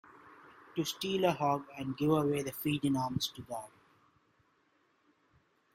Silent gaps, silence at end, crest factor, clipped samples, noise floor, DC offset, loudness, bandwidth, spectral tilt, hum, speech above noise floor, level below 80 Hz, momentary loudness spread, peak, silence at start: none; 2.05 s; 20 dB; under 0.1%; -73 dBFS; under 0.1%; -34 LUFS; 16 kHz; -5.5 dB/octave; none; 40 dB; -68 dBFS; 13 LU; -16 dBFS; 0.25 s